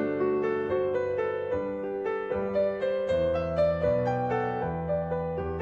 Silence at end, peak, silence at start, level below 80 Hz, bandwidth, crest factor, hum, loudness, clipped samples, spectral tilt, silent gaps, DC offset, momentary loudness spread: 0 s; -14 dBFS; 0 s; -52 dBFS; 7.6 kHz; 14 dB; none; -28 LUFS; under 0.1%; -8.5 dB/octave; none; under 0.1%; 5 LU